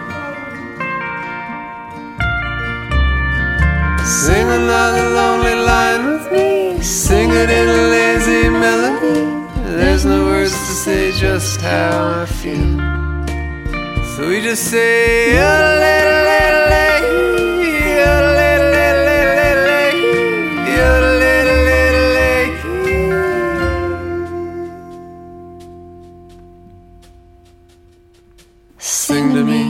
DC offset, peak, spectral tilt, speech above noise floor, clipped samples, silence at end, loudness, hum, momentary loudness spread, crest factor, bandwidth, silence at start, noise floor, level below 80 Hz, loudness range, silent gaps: under 0.1%; 0 dBFS; -4.5 dB/octave; 34 dB; under 0.1%; 0 s; -14 LUFS; none; 12 LU; 14 dB; 16.5 kHz; 0 s; -47 dBFS; -24 dBFS; 9 LU; none